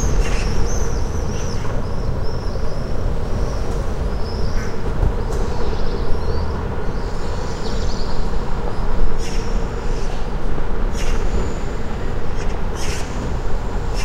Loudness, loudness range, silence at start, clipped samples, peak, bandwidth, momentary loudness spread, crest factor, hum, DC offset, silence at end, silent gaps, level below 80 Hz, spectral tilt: -25 LUFS; 1 LU; 0 s; under 0.1%; -2 dBFS; 9.2 kHz; 4 LU; 14 dB; none; under 0.1%; 0 s; none; -22 dBFS; -5.5 dB/octave